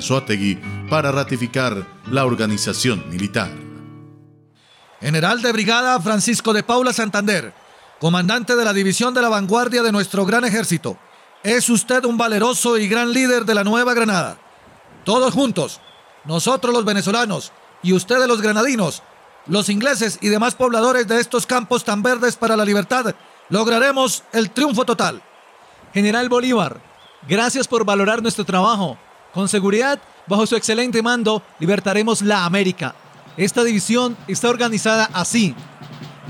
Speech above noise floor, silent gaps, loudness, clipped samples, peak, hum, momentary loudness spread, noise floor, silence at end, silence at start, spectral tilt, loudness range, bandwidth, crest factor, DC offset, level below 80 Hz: 34 dB; none; -18 LUFS; under 0.1%; -6 dBFS; none; 9 LU; -51 dBFS; 0 s; 0 s; -4 dB/octave; 3 LU; 16.5 kHz; 14 dB; under 0.1%; -62 dBFS